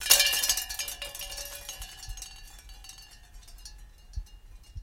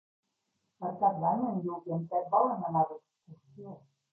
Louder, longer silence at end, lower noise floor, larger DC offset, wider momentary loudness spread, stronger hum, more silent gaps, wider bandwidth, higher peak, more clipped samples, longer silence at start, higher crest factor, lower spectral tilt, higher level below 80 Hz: first, -27 LUFS vs -31 LUFS; second, 0 s vs 0.35 s; second, -50 dBFS vs -81 dBFS; neither; first, 26 LU vs 21 LU; neither; neither; first, 17 kHz vs 2.3 kHz; first, -2 dBFS vs -12 dBFS; neither; second, 0 s vs 0.8 s; first, 30 dB vs 20 dB; second, 1.5 dB/octave vs -12.5 dB/octave; first, -46 dBFS vs -78 dBFS